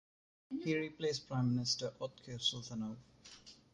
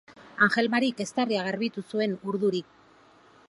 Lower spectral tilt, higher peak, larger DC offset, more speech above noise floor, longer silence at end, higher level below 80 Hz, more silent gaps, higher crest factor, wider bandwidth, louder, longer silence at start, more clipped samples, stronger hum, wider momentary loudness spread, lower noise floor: about the same, -4.5 dB/octave vs -5 dB/octave; second, -20 dBFS vs -8 dBFS; neither; second, 20 dB vs 30 dB; second, 0.2 s vs 0.85 s; about the same, -72 dBFS vs -74 dBFS; neither; about the same, 20 dB vs 20 dB; about the same, 11 kHz vs 11.5 kHz; second, -38 LUFS vs -27 LUFS; first, 0.5 s vs 0.1 s; neither; neither; first, 20 LU vs 8 LU; about the same, -59 dBFS vs -57 dBFS